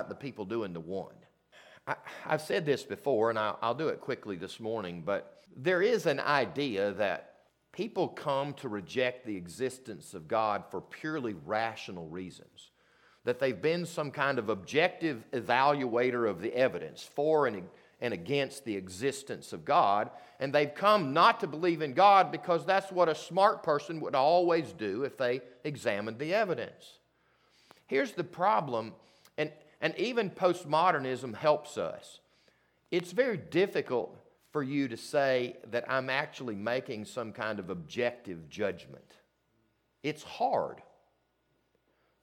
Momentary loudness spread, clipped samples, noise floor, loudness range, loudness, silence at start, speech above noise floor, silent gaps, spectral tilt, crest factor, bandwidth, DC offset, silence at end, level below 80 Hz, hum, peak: 13 LU; under 0.1%; -75 dBFS; 9 LU; -31 LUFS; 0 s; 44 dB; none; -5 dB/octave; 22 dB; 16.5 kHz; under 0.1%; 1.4 s; -76 dBFS; none; -10 dBFS